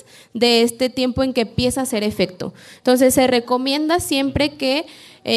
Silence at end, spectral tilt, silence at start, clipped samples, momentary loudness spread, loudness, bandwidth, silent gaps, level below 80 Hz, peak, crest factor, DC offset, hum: 0 s; -4 dB/octave; 0.35 s; under 0.1%; 10 LU; -18 LUFS; 14.5 kHz; none; -44 dBFS; -4 dBFS; 16 dB; under 0.1%; none